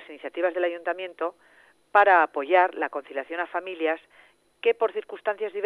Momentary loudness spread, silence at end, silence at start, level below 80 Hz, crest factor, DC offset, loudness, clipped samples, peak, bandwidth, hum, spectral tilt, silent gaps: 14 LU; 0 s; 0 s; -82 dBFS; 20 dB; under 0.1%; -25 LUFS; under 0.1%; -6 dBFS; 10.5 kHz; none; -4 dB/octave; none